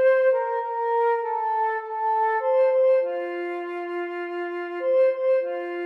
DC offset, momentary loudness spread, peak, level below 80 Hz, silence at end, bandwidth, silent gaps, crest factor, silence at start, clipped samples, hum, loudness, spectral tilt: under 0.1%; 10 LU; -12 dBFS; under -90 dBFS; 0 s; 5 kHz; none; 12 dB; 0 s; under 0.1%; none; -24 LUFS; -4 dB/octave